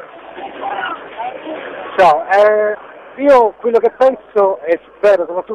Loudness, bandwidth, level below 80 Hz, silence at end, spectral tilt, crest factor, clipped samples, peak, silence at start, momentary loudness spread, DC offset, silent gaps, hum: -14 LUFS; 10 kHz; -56 dBFS; 0 s; -5 dB/octave; 12 dB; under 0.1%; -2 dBFS; 0 s; 16 LU; under 0.1%; none; none